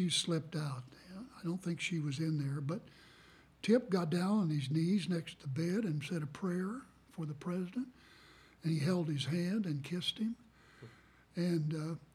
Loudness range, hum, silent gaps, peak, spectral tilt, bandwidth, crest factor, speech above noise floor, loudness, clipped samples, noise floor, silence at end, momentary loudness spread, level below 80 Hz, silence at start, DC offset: 5 LU; none; none; -18 dBFS; -6 dB/octave; 14 kHz; 18 dB; 26 dB; -37 LUFS; under 0.1%; -62 dBFS; 0.15 s; 15 LU; -72 dBFS; 0 s; under 0.1%